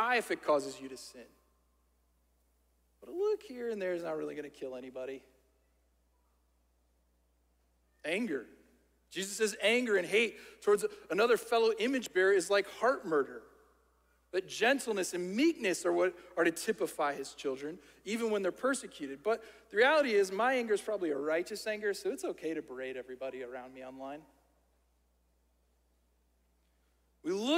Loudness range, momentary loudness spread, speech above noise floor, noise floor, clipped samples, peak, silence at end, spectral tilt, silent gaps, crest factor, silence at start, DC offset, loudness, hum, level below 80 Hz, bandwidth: 15 LU; 16 LU; 40 dB; -73 dBFS; under 0.1%; -14 dBFS; 0 s; -3 dB/octave; none; 20 dB; 0 s; under 0.1%; -33 LUFS; none; -74 dBFS; 16 kHz